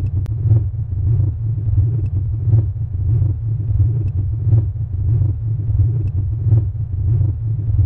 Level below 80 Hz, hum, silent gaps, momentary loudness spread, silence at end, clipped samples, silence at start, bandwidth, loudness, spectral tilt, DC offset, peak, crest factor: -26 dBFS; none; none; 5 LU; 0 s; under 0.1%; 0 s; 1.4 kHz; -18 LUFS; -13 dB/octave; under 0.1%; -6 dBFS; 12 dB